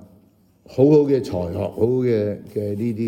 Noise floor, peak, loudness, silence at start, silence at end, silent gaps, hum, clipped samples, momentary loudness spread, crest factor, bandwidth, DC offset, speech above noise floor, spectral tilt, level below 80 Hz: -55 dBFS; -4 dBFS; -20 LUFS; 0.7 s; 0 s; none; none; under 0.1%; 12 LU; 16 dB; 13.5 kHz; under 0.1%; 36 dB; -9 dB/octave; -56 dBFS